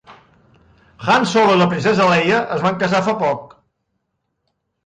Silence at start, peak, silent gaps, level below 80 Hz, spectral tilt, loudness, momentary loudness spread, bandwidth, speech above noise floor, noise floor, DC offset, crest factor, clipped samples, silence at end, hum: 0.1 s; -4 dBFS; none; -56 dBFS; -5.5 dB/octave; -16 LUFS; 7 LU; 9.4 kHz; 57 dB; -73 dBFS; under 0.1%; 14 dB; under 0.1%; 1.4 s; none